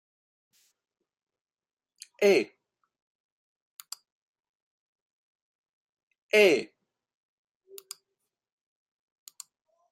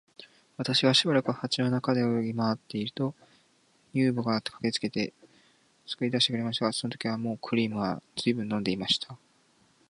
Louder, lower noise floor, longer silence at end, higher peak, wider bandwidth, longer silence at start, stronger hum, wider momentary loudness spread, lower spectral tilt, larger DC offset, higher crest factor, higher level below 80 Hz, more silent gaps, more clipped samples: first, -24 LUFS vs -28 LUFS; first, under -90 dBFS vs -66 dBFS; first, 3.25 s vs 0.75 s; about the same, -8 dBFS vs -8 dBFS; first, 16 kHz vs 11.5 kHz; first, 2.2 s vs 0.2 s; neither; first, 25 LU vs 9 LU; second, -3.5 dB/octave vs -5 dB/octave; neither; about the same, 26 dB vs 22 dB; second, -84 dBFS vs -68 dBFS; first, 3.02-3.77 s, 4.12-4.34 s, 4.49-5.97 s, 6.03-6.07 s, 6.18-6.29 s vs none; neither